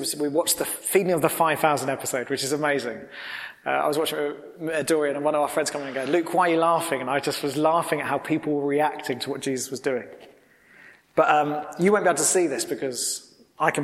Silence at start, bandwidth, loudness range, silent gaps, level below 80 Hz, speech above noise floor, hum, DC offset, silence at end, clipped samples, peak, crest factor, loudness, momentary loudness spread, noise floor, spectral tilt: 0 s; 16.5 kHz; 3 LU; none; -68 dBFS; 30 dB; none; under 0.1%; 0 s; under 0.1%; -4 dBFS; 20 dB; -24 LUFS; 9 LU; -54 dBFS; -3.5 dB/octave